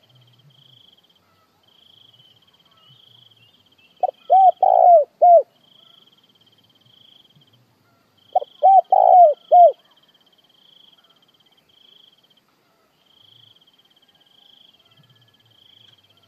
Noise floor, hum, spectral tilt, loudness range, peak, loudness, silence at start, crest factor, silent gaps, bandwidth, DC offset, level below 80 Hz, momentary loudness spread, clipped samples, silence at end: -62 dBFS; none; -5 dB/octave; 8 LU; -4 dBFS; -14 LUFS; 4.05 s; 18 dB; none; 3.7 kHz; under 0.1%; -88 dBFS; 15 LU; under 0.1%; 6.55 s